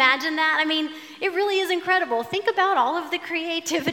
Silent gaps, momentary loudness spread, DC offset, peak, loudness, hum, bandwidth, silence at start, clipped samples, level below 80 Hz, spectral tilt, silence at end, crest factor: none; 6 LU; under 0.1%; -2 dBFS; -22 LUFS; none; 17.5 kHz; 0 s; under 0.1%; -80 dBFS; -2.5 dB/octave; 0 s; 20 dB